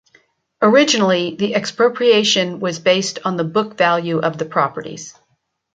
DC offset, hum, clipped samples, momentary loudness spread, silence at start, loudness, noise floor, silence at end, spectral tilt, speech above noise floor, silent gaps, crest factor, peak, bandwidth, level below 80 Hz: under 0.1%; none; under 0.1%; 9 LU; 0.6 s; -16 LUFS; -68 dBFS; 0.65 s; -4 dB/octave; 51 dB; none; 16 dB; -2 dBFS; 9.4 kHz; -64 dBFS